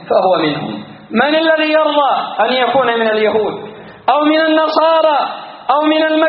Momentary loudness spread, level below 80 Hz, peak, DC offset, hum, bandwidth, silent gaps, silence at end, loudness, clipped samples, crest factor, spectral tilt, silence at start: 10 LU; -60 dBFS; 0 dBFS; under 0.1%; none; 5.2 kHz; none; 0 s; -13 LUFS; under 0.1%; 14 dB; -1.5 dB/octave; 0 s